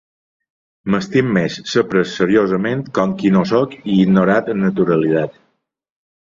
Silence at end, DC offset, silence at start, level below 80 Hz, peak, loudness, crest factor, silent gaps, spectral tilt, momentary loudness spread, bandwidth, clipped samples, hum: 1 s; under 0.1%; 0.85 s; -52 dBFS; -2 dBFS; -16 LUFS; 16 dB; none; -7 dB/octave; 6 LU; 7.4 kHz; under 0.1%; none